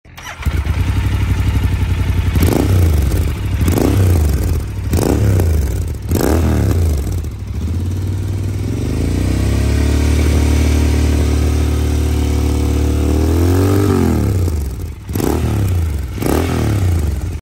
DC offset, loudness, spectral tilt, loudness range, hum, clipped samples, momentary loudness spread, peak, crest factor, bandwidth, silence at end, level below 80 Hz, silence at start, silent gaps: under 0.1%; -16 LUFS; -6.5 dB/octave; 3 LU; none; under 0.1%; 7 LU; -2 dBFS; 14 dB; 16.5 kHz; 0 s; -18 dBFS; 0.05 s; none